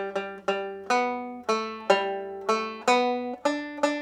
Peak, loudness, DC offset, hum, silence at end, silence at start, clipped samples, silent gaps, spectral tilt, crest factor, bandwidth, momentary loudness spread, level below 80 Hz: -6 dBFS; -27 LUFS; under 0.1%; none; 0 s; 0 s; under 0.1%; none; -3 dB/octave; 22 dB; 15 kHz; 8 LU; -76 dBFS